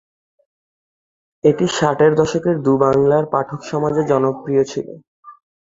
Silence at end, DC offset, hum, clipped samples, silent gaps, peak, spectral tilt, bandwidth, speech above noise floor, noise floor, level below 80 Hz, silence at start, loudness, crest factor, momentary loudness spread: 0.35 s; under 0.1%; none; under 0.1%; 5.07-5.23 s; -2 dBFS; -6.5 dB/octave; 7.8 kHz; over 74 dB; under -90 dBFS; -54 dBFS; 1.45 s; -17 LUFS; 16 dB; 8 LU